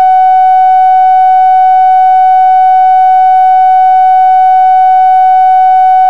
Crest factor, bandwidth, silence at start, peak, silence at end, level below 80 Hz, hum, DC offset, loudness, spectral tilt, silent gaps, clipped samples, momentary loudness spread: 4 dB; 4.7 kHz; 0 s; 0 dBFS; 0 s; -72 dBFS; none; 4%; -5 LUFS; -1 dB/octave; none; under 0.1%; 0 LU